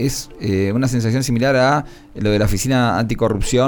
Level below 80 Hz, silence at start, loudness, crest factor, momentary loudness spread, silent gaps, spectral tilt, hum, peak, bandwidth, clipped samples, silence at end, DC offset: -32 dBFS; 0 s; -18 LUFS; 12 dB; 7 LU; none; -5.5 dB/octave; none; -4 dBFS; over 20 kHz; under 0.1%; 0 s; under 0.1%